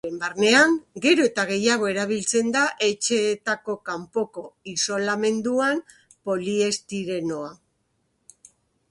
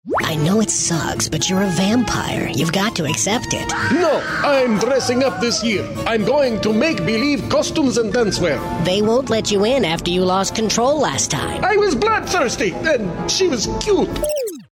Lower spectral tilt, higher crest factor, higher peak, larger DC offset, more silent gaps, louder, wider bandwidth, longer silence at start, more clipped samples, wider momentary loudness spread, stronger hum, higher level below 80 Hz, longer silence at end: about the same, -3 dB/octave vs -4 dB/octave; about the same, 20 dB vs 16 dB; about the same, -4 dBFS vs -2 dBFS; neither; neither; second, -23 LUFS vs -17 LUFS; second, 11.5 kHz vs 16 kHz; about the same, 0.05 s vs 0.05 s; neither; first, 12 LU vs 4 LU; neither; second, -68 dBFS vs -40 dBFS; first, 1.35 s vs 0.1 s